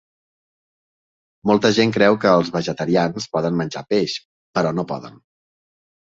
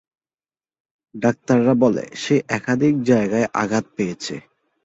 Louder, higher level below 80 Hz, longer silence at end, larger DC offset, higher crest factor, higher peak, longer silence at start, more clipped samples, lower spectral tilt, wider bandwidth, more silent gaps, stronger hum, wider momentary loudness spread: about the same, -19 LUFS vs -20 LUFS; about the same, -58 dBFS vs -58 dBFS; first, 0.9 s vs 0.45 s; neither; about the same, 20 dB vs 18 dB; about the same, -2 dBFS vs -4 dBFS; first, 1.45 s vs 1.15 s; neither; about the same, -5.5 dB/octave vs -6 dB/octave; about the same, 7.8 kHz vs 8 kHz; first, 4.25-4.53 s vs none; neither; about the same, 11 LU vs 9 LU